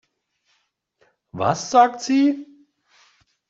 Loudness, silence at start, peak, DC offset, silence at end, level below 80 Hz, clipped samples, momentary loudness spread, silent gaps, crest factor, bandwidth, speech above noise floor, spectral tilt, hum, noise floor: -19 LUFS; 1.35 s; -4 dBFS; under 0.1%; 1.05 s; -66 dBFS; under 0.1%; 13 LU; none; 20 dB; 7.8 kHz; 51 dB; -5 dB/octave; none; -70 dBFS